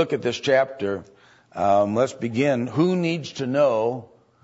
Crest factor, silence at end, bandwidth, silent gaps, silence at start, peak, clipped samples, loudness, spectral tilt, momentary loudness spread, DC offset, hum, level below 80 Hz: 16 dB; 0.4 s; 8 kHz; none; 0 s; -6 dBFS; under 0.1%; -22 LUFS; -6 dB/octave; 9 LU; under 0.1%; none; -66 dBFS